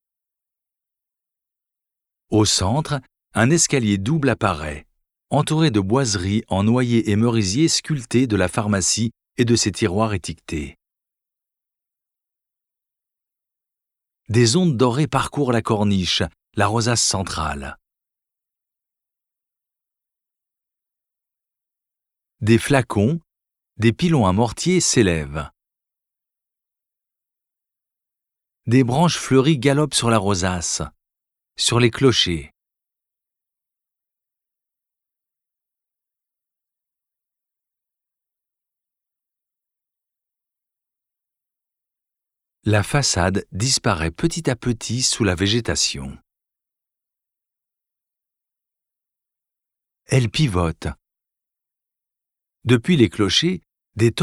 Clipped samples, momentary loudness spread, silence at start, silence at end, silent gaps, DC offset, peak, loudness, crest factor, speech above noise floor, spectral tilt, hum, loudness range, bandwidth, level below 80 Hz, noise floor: under 0.1%; 12 LU; 2.3 s; 0 s; none; under 0.1%; -2 dBFS; -19 LUFS; 22 dB; 65 dB; -4.5 dB/octave; none; 8 LU; 14.5 kHz; -48 dBFS; -84 dBFS